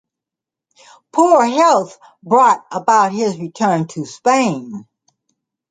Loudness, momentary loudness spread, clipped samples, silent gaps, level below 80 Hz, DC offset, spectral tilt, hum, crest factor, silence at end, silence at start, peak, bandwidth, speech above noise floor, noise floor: -15 LUFS; 14 LU; under 0.1%; none; -68 dBFS; under 0.1%; -5 dB/octave; none; 16 dB; 0.9 s; 1.15 s; -2 dBFS; 9.6 kHz; 71 dB; -86 dBFS